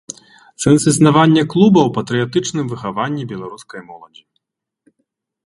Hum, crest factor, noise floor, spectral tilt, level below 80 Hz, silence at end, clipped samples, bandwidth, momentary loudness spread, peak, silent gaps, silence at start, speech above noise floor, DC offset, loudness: none; 16 dB; -75 dBFS; -5.5 dB/octave; -52 dBFS; 1.4 s; under 0.1%; 11.5 kHz; 22 LU; 0 dBFS; none; 0.6 s; 61 dB; under 0.1%; -14 LUFS